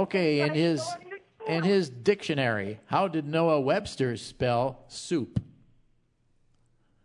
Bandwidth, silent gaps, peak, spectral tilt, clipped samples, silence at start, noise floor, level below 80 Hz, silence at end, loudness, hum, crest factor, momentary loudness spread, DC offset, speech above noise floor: 11 kHz; none; -10 dBFS; -6 dB/octave; under 0.1%; 0 s; -67 dBFS; -60 dBFS; 1.6 s; -28 LUFS; none; 18 dB; 11 LU; under 0.1%; 40 dB